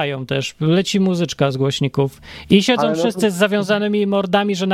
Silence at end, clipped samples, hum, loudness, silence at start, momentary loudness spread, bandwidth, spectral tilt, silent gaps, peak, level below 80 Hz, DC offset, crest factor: 0 s; under 0.1%; none; -18 LUFS; 0 s; 6 LU; 14.5 kHz; -5.5 dB/octave; none; 0 dBFS; -52 dBFS; under 0.1%; 16 dB